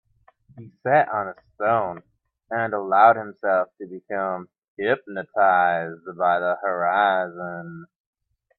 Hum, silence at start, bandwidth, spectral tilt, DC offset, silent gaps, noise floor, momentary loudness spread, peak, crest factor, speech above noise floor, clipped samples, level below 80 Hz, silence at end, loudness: none; 0.55 s; 4.3 kHz; -9.5 dB/octave; under 0.1%; 4.58-4.62 s, 4.68-4.77 s; -57 dBFS; 16 LU; -2 dBFS; 22 dB; 35 dB; under 0.1%; -68 dBFS; 0.75 s; -22 LUFS